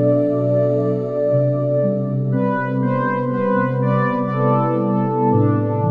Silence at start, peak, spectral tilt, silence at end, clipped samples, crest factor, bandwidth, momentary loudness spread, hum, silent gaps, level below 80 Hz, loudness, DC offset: 0 s; -6 dBFS; -11 dB/octave; 0 s; under 0.1%; 12 dB; 4.3 kHz; 3 LU; none; none; -60 dBFS; -18 LUFS; under 0.1%